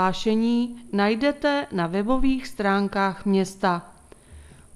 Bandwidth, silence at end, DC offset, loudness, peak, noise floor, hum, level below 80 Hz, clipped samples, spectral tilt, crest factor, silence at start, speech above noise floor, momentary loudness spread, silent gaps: 12.5 kHz; 0.3 s; under 0.1%; -24 LUFS; -8 dBFS; -47 dBFS; none; -44 dBFS; under 0.1%; -6 dB/octave; 16 dB; 0 s; 25 dB; 4 LU; none